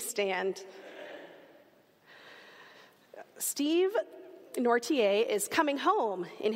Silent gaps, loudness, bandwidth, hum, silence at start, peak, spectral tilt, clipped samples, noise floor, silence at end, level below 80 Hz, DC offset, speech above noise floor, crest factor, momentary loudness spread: none; -30 LUFS; 16 kHz; none; 0 s; -12 dBFS; -2.5 dB/octave; under 0.1%; -62 dBFS; 0 s; -88 dBFS; under 0.1%; 33 dB; 20 dB; 24 LU